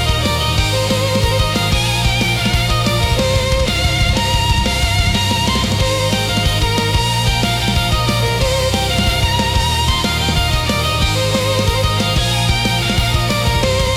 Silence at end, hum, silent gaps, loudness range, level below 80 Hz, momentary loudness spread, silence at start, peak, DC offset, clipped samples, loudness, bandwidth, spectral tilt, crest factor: 0 s; none; none; 0 LU; -22 dBFS; 1 LU; 0 s; -2 dBFS; under 0.1%; under 0.1%; -15 LUFS; 16.5 kHz; -4 dB/octave; 12 dB